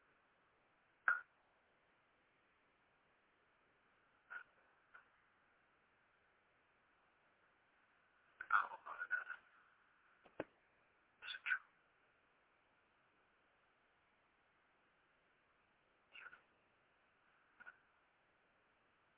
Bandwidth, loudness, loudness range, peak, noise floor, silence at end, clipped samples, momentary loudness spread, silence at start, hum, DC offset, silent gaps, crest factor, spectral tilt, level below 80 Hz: 3.8 kHz; -44 LUFS; 20 LU; -20 dBFS; -78 dBFS; 1.45 s; under 0.1%; 23 LU; 1.05 s; none; under 0.1%; none; 32 dB; 5.5 dB/octave; under -90 dBFS